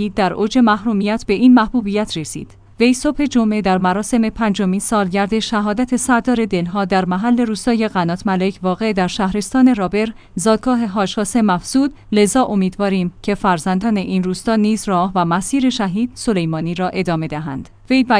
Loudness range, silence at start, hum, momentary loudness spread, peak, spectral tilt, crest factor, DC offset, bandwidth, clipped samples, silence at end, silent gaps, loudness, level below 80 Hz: 2 LU; 0 s; none; 6 LU; 0 dBFS; -5.5 dB/octave; 16 dB; under 0.1%; 10.5 kHz; under 0.1%; 0 s; none; -17 LUFS; -42 dBFS